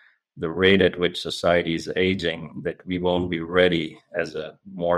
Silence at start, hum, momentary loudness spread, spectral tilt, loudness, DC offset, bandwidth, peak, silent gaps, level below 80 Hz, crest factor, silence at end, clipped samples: 0.35 s; none; 13 LU; -5.5 dB/octave; -23 LUFS; under 0.1%; 12.5 kHz; -6 dBFS; none; -52 dBFS; 18 dB; 0 s; under 0.1%